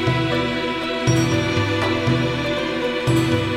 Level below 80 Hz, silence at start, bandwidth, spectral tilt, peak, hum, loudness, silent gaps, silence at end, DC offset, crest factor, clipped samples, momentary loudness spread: -42 dBFS; 0 s; 13.5 kHz; -5.5 dB/octave; -6 dBFS; none; -20 LUFS; none; 0 s; under 0.1%; 14 dB; under 0.1%; 4 LU